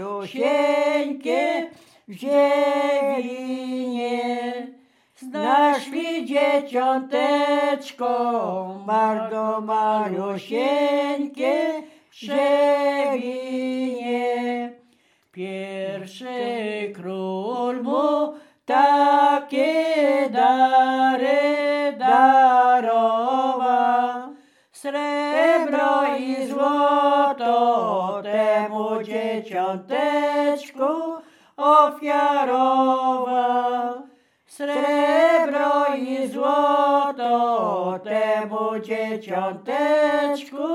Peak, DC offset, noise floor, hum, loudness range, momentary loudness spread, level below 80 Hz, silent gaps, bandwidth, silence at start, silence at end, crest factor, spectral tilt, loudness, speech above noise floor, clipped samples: -2 dBFS; under 0.1%; -61 dBFS; none; 6 LU; 11 LU; -88 dBFS; none; 14 kHz; 0 s; 0 s; 18 dB; -5 dB/octave; -21 LUFS; 40 dB; under 0.1%